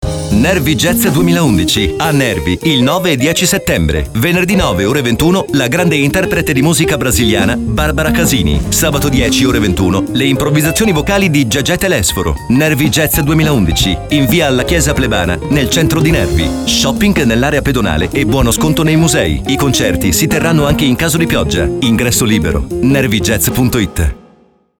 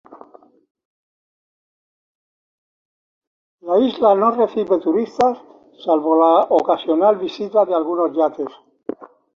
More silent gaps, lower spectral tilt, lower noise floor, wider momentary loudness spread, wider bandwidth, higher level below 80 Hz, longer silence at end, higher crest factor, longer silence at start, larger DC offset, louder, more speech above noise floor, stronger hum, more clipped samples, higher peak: second, none vs 0.70-0.75 s, 0.85-3.21 s, 3.27-3.58 s; second, -4.5 dB/octave vs -6.5 dB/octave; about the same, -48 dBFS vs -46 dBFS; second, 3 LU vs 18 LU; first, 18.5 kHz vs 7.4 kHz; first, -24 dBFS vs -66 dBFS; first, 0.6 s vs 0.3 s; second, 10 dB vs 18 dB; about the same, 0 s vs 0.1 s; neither; first, -11 LUFS vs -17 LUFS; first, 37 dB vs 29 dB; neither; neither; about the same, -2 dBFS vs -2 dBFS